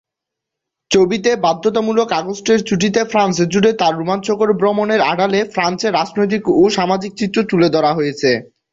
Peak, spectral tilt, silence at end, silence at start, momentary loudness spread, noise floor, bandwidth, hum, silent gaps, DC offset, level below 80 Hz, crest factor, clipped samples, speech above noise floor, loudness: -2 dBFS; -5 dB/octave; 0.3 s; 0.9 s; 5 LU; -82 dBFS; 7.8 kHz; none; none; under 0.1%; -54 dBFS; 14 dB; under 0.1%; 67 dB; -15 LUFS